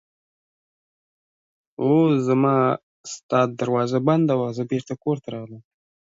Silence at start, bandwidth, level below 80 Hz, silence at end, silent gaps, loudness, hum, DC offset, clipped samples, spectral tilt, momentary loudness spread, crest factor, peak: 1.8 s; 8 kHz; -68 dBFS; 0.55 s; 2.83-3.04 s, 3.23-3.29 s; -21 LUFS; none; under 0.1%; under 0.1%; -7.5 dB/octave; 16 LU; 18 dB; -6 dBFS